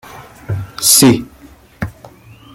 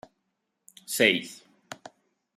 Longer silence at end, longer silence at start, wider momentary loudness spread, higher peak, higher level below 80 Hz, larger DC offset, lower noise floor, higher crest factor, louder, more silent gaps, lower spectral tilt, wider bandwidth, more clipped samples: about the same, 0.65 s vs 0.65 s; second, 0.1 s vs 0.9 s; second, 20 LU vs 23 LU; first, 0 dBFS vs -6 dBFS; first, -44 dBFS vs -76 dBFS; neither; second, -42 dBFS vs -79 dBFS; second, 16 dB vs 26 dB; first, -11 LUFS vs -24 LUFS; neither; about the same, -3.5 dB/octave vs -2.5 dB/octave; first, over 20 kHz vs 15.5 kHz; neither